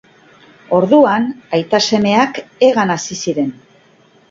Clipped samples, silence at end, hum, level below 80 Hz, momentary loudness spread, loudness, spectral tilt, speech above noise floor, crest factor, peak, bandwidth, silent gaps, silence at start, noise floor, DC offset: under 0.1%; 0.8 s; none; -56 dBFS; 9 LU; -14 LUFS; -4.5 dB/octave; 36 dB; 16 dB; 0 dBFS; 7.8 kHz; none; 0.7 s; -50 dBFS; under 0.1%